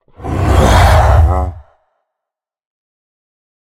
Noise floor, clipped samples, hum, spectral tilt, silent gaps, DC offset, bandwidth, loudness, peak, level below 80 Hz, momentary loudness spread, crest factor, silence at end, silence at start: -83 dBFS; under 0.1%; none; -6 dB/octave; none; under 0.1%; 15 kHz; -11 LUFS; 0 dBFS; -18 dBFS; 12 LU; 14 dB; 2.15 s; 0.2 s